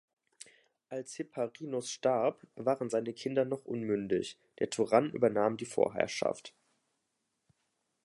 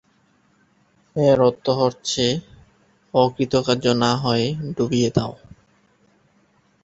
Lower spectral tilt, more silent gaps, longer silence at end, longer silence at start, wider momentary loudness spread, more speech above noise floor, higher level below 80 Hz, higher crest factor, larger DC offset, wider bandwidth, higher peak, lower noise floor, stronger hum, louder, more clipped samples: about the same, -5 dB/octave vs -5.5 dB/octave; neither; about the same, 1.55 s vs 1.55 s; second, 0.9 s vs 1.15 s; first, 14 LU vs 7 LU; first, 50 dB vs 41 dB; second, -76 dBFS vs -52 dBFS; about the same, 22 dB vs 20 dB; neither; first, 11.5 kHz vs 8.2 kHz; second, -12 dBFS vs -2 dBFS; first, -82 dBFS vs -61 dBFS; neither; second, -33 LUFS vs -20 LUFS; neither